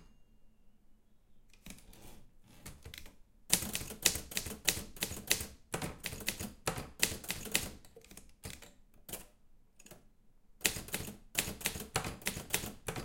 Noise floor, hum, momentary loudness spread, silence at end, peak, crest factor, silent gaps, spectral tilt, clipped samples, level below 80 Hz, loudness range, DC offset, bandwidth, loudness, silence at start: -62 dBFS; none; 22 LU; 0 s; -4 dBFS; 36 dB; none; -1.5 dB/octave; under 0.1%; -56 dBFS; 8 LU; under 0.1%; 17 kHz; -36 LUFS; 0 s